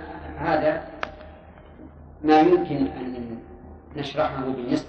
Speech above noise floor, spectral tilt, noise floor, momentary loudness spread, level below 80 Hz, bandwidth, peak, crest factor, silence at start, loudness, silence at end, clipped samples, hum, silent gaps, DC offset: 24 dB; -7 dB/octave; -46 dBFS; 23 LU; -48 dBFS; 8.4 kHz; -6 dBFS; 20 dB; 0 s; -24 LUFS; 0 s; under 0.1%; none; none; under 0.1%